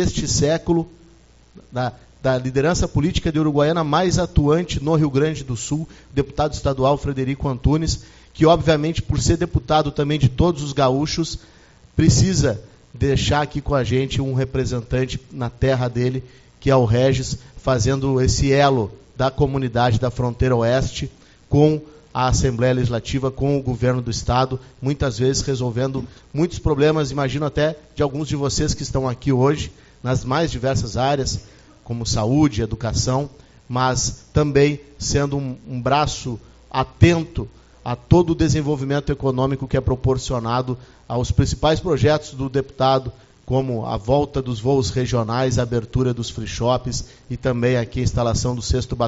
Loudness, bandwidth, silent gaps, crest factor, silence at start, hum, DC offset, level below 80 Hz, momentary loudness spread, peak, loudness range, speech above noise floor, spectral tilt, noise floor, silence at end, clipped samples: -20 LUFS; 8 kHz; none; 20 dB; 0 s; none; under 0.1%; -34 dBFS; 10 LU; 0 dBFS; 3 LU; 31 dB; -6 dB/octave; -50 dBFS; 0 s; under 0.1%